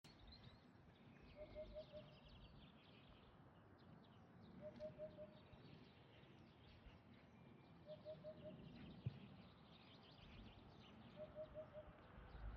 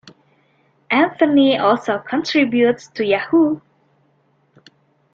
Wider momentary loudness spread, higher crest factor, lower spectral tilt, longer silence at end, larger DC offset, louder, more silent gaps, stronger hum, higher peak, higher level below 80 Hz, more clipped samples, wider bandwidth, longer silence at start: first, 10 LU vs 7 LU; first, 24 dB vs 16 dB; about the same, -5.5 dB/octave vs -5.5 dB/octave; second, 0 s vs 1.55 s; neither; second, -62 LUFS vs -17 LUFS; neither; neither; second, -36 dBFS vs -2 dBFS; second, -70 dBFS vs -64 dBFS; neither; second, 6.2 kHz vs 7.4 kHz; about the same, 0.05 s vs 0.05 s